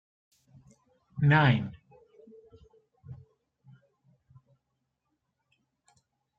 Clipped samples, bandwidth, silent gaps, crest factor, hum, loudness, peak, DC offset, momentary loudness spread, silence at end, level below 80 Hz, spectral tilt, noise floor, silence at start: under 0.1%; 5.2 kHz; none; 24 dB; none; -25 LUFS; -10 dBFS; under 0.1%; 28 LU; 3.25 s; -64 dBFS; -8.5 dB/octave; -81 dBFS; 1.15 s